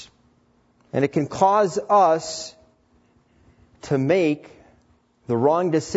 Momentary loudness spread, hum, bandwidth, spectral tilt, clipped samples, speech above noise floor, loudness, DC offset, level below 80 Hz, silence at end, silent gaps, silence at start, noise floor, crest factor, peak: 13 LU; none; 8 kHz; -6 dB/octave; under 0.1%; 41 dB; -21 LUFS; under 0.1%; -60 dBFS; 0 s; none; 0 s; -61 dBFS; 18 dB; -4 dBFS